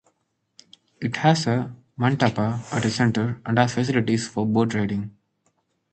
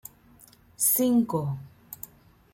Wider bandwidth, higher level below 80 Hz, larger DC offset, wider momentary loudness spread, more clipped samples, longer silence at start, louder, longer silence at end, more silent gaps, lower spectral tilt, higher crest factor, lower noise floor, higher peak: second, 9 kHz vs 16.5 kHz; first, -56 dBFS vs -64 dBFS; neither; second, 8 LU vs 23 LU; neither; first, 1 s vs 0.8 s; about the same, -23 LUFS vs -24 LUFS; first, 0.8 s vs 0.6 s; neither; about the same, -6 dB/octave vs -5.5 dB/octave; about the same, 20 dB vs 18 dB; first, -72 dBFS vs -55 dBFS; first, -4 dBFS vs -10 dBFS